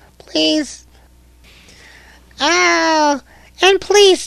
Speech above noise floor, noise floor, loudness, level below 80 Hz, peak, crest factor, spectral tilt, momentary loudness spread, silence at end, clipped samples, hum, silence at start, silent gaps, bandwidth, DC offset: 34 dB; -47 dBFS; -14 LUFS; -48 dBFS; 0 dBFS; 16 dB; -1 dB/octave; 11 LU; 0 s; under 0.1%; none; 0.35 s; none; 13.5 kHz; under 0.1%